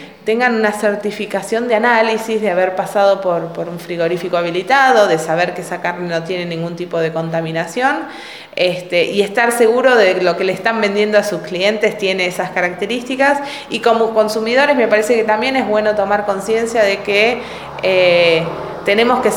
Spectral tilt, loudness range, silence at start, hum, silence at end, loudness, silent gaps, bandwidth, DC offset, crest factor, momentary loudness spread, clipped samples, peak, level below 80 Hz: -4.5 dB/octave; 3 LU; 0 s; none; 0 s; -15 LUFS; none; 19.5 kHz; 0.1%; 14 dB; 9 LU; under 0.1%; 0 dBFS; -54 dBFS